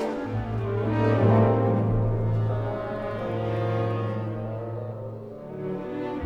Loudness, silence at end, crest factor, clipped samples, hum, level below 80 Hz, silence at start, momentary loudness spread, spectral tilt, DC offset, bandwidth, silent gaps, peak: -26 LUFS; 0 s; 18 dB; under 0.1%; none; -44 dBFS; 0 s; 14 LU; -9.5 dB/octave; under 0.1%; 5 kHz; none; -8 dBFS